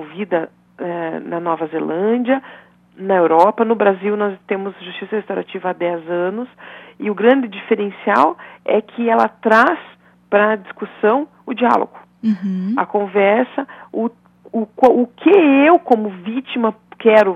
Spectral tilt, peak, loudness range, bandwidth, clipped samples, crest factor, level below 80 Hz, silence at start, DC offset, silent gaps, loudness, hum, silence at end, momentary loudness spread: -7.5 dB/octave; 0 dBFS; 5 LU; 8 kHz; under 0.1%; 16 dB; -66 dBFS; 0 s; under 0.1%; none; -17 LUFS; 60 Hz at -55 dBFS; 0 s; 14 LU